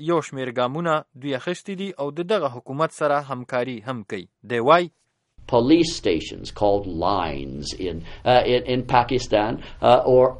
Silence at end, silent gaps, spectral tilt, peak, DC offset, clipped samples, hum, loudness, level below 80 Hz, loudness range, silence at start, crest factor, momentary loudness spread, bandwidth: 0 s; none; -5.5 dB/octave; -2 dBFS; under 0.1%; under 0.1%; none; -22 LUFS; -44 dBFS; 4 LU; 0 s; 20 dB; 13 LU; 11.5 kHz